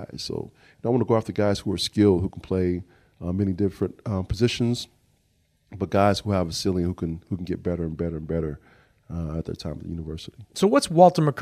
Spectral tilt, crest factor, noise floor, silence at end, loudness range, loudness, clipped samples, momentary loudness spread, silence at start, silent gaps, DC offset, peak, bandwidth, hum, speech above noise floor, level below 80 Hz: -6.5 dB/octave; 22 dB; -67 dBFS; 0 s; 6 LU; -24 LUFS; under 0.1%; 14 LU; 0 s; none; under 0.1%; -2 dBFS; 15.5 kHz; none; 43 dB; -46 dBFS